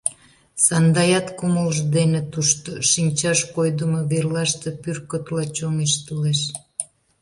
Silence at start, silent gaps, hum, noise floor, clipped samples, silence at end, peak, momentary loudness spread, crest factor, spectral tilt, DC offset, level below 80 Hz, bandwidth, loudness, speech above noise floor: 0.05 s; none; none; -43 dBFS; under 0.1%; 0.35 s; -2 dBFS; 11 LU; 20 dB; -4 dB/octave; under 0.1%; -56 dBFS; 11.5 kHz; -20 LUFS; 22 dB